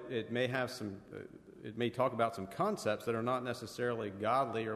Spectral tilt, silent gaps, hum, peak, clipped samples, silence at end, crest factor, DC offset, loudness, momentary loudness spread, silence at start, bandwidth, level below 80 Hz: -5.5 dB/octave; none; none; -18 dBFS; under 0.1%; 0 s; 18 dB; under 0.1%; -36 LUFS; 15 LU; 0 s; 13.5 kHz; -72 dBFS